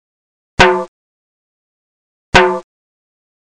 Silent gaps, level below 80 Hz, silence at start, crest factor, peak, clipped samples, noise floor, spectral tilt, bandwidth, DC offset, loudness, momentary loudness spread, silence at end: 0.88-2.32 s; -34 dBFS; 0.6 s; 18 dB; 0 dBFS; under 0.1%; under -90 dBFS; -4 dB/octave; 11 kHz; under 0.1%; -12 LUFS; 15 LU; 0.95 s